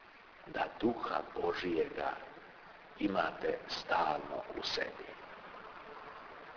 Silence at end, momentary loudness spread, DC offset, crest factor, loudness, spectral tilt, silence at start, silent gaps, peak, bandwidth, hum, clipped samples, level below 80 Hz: 0 s; 17 LU; under 0.1%; 20 dB; -37 LUFS; -2 dB/octave; 0 s; none; -20 dBFS; 5.4 kHz; none; under 0.1%; -66 dBFS